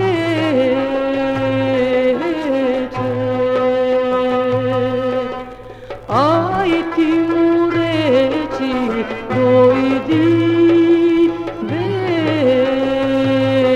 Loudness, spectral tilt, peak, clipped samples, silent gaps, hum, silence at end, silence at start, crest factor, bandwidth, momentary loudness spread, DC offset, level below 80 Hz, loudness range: -16 LUFS; -7.5 dB/octave; 0 dBFS; under 0.1%; none; none; 0 s; 0 s; 14 dB; 8.4 kHz; 8 LU; under 0.1%; -46 dBFS; 3 LU